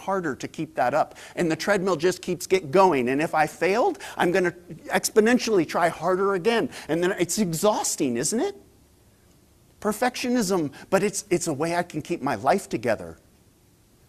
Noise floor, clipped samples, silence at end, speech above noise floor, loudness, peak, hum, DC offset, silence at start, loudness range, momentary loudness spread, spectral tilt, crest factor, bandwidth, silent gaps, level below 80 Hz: -58 dBFS; under 0.1%; 0.95 s; 34 dB; -24 LUFS; -6 dBFS; none; under 0.1%; 0 s; 4 LU; 8 LU; -4 dB/octave; 18 dB; 15 kHz; none; -60 dBFS